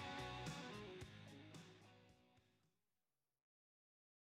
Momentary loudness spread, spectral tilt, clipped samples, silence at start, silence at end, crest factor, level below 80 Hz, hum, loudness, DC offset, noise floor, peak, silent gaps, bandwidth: 15 LU; -4.5 dB/octave; under 0.1%; 0 s; 1.85 s; 18 dB; -74 dBFS; none; -54 LUFS; under 0.1%; under -90 dBFS; -38 dBFS; none; 15.5 kHz